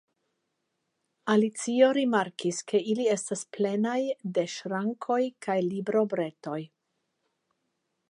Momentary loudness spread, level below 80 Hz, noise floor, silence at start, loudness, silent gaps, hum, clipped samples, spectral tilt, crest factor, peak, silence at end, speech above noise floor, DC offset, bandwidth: 10 LU; -82 dBFS; -80 dBFS; 1.25 s; -28 LUFS; none; none; under 0.1%; -5 dB/octave; 20 dB; -8 dBFS; 1.45 s; 53 dB; under 0.1%; 11 kHz